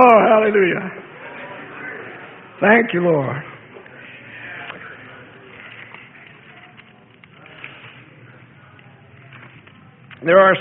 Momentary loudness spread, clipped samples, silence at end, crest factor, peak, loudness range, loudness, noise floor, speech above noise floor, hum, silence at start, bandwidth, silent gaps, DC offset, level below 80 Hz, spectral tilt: 27 LU; under 0.1%; 0 s; 20 dB; 0 dBFS; 22 LU; -16 LUFS; -47 dBFS; 32 dB; none; 0 s; 3.9 kHz; none; under 0.1%; -64 dBFS; -9 dB/octave